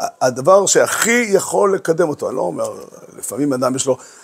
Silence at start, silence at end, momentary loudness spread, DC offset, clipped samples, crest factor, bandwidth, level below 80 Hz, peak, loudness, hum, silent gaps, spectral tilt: 0 s; 0.15 s; 13 LU; under 0.1%; under 0.1%; 16 dB; 16 kHz; -64 dBFS; 0 dBFS; -16 LUFS; none; none; -3.5 dB/octave